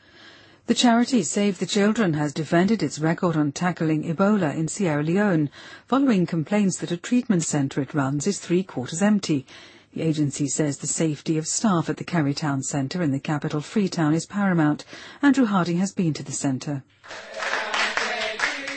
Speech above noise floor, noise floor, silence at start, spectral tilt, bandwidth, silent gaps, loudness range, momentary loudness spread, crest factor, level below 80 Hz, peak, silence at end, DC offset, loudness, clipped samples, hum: 27 dB; -49 dBFS; 0.25 s; -5 dB/octave; 8.8 kHz; none; 2 LU; 6 LU; 18 dB; -62 dBFS; -6 dBFS; 0 s; under 0.1%; -23 LUFS; under 0.1%; none